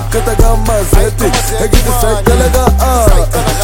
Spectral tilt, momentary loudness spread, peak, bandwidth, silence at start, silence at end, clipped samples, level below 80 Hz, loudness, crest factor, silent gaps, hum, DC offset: -5 dB/octave; 3 LU; 0 dBFS; 17 kHz; 0 s; 0 s; 0.3%; -12 dBFS; -11 LUFS; 8 dB; none; none; under 0.1%